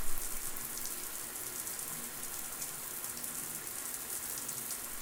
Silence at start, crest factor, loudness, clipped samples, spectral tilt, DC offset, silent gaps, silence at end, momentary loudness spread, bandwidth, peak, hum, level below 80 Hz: 0 s; 22 dB; -38 LUFS; under 0.1%; -0.5 dB/octave; under 0.1%; none; 0 s; 2 LU; 19 kHz; -16 dBFS; none; -50 dBFS